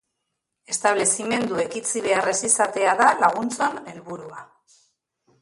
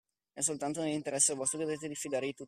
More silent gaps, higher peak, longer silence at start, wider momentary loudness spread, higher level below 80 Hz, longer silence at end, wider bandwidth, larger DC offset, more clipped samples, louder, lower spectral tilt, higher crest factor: neither; first, -4 dBFS vs -14 dBFS; first, 0.7 s vs 0.35 s; first, 19 LU vs 8 LU; first, -66 dBFS vs -76 dBFS; first, 0.95 s vs 0 s; second, 11.5 kHz vs 15 kHz; neither; neither; first, -21 LUFS vs -32 LUFS; about the same, -2 dB/octave vs -3 dB/octave; about the same, 20 dB vs 22 dB